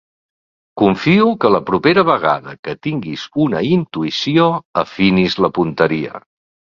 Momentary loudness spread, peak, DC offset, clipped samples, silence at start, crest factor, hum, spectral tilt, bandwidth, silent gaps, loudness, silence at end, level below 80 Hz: 11 LU; 0 dBFS; under 0.1%; under 0.1%; 0.75 s; 16 dB; none; -7 dB/octave; 7.2 kHz; 2.59-2.63 s, 4.65-4.74 s; -15 LUFS; 0.55 s; -50 dBFS